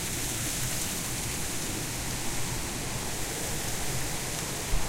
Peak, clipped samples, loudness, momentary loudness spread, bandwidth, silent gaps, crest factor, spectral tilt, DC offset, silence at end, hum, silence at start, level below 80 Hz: -14 dBFS; under 0.1%; -31 LUFS; 3 LU; 16 kHz; none; 16 dB; -2.5 dB/octave; under 0.1%; 0 s; none; 0 s; -40 dBFS